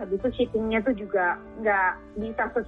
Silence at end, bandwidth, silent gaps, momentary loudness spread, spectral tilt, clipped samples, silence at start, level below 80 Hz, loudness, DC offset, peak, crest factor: 0 s; 4.5 kHz; none; 6 LU; -8 dB/octave; under 0.1%; 0 s; -48 dBFS; -26 LUFS; under 0.1%; -12 dBFS; 14 dB